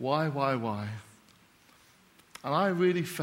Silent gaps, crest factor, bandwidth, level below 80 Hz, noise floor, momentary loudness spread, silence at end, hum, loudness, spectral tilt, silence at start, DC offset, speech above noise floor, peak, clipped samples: none; 18 dB; 16.5 kHz; -74 dBFS; -61 dBFS; 16 LU; 0 s; none; -30 LUFS; -6.5 dB/octave; 0 s; under 0.1%; 32 dB; -14 dBFS; under 0.1%